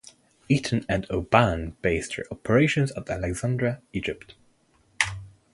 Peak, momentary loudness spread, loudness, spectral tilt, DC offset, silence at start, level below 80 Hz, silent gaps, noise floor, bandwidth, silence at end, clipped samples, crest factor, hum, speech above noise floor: -2 dBFS; 11 LU; -25 LUFS; -5.5 dB/octave; under 0.1%; 0.5 s; -44 dBFS; none; -63 dBFS; 11.5 kHz; 0.25 s; under 0.1%; 24 dB; none; 38 dB